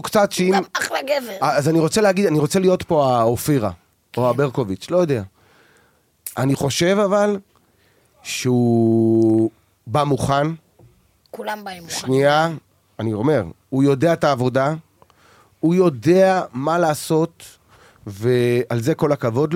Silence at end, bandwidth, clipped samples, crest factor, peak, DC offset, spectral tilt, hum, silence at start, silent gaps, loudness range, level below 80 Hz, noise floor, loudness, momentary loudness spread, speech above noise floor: 0 s; 16.5 kHz; under 0.1%; 16 dB; -4 dBFS; under 0.1%; -6 dB/octave; none; 0.05 s; none; 4 LU; -54 dBFS; -58 dBFS; -19 LUFS; 12 LU; 41 dB